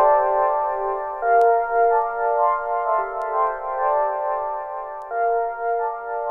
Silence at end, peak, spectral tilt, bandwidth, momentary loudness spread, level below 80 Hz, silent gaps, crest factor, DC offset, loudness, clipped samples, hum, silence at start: 0 s; -6 dBFS; -5.5 dB/octave; 3.6 kHz; 9 LU; -54 dBFS; none; 14 dB; under 0.1%; -21 LUFS; under 0.1%; none; 0 s